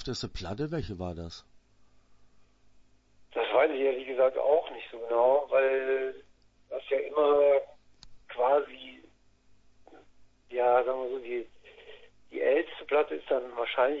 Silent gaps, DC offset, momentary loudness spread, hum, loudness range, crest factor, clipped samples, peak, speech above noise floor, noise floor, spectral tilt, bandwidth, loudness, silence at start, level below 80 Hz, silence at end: none; under 0.1%; 17 LU; none; 6 LU; 18 dB; under 0.1%; -12 dBFS; 33 dB; -61 dBFS; -5.5 dB/octave; 7.8 kHz; -28 LUFS; 0 s; -56 dBFS; 0 s